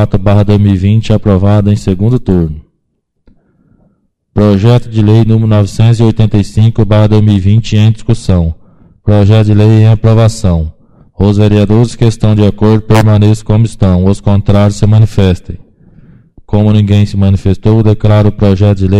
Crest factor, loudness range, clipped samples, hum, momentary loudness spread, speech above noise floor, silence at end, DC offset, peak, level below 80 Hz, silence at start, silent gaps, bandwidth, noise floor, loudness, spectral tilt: 8 dB; 4 LU; 0.9%; none; 6 LU; 56 dB; 0 s; under 0.1%; 0 dBFS; -24 dBFS; 0 s; none; 9.8 kHz; -62 dBFS; -8 LUFS; -8 dB/octave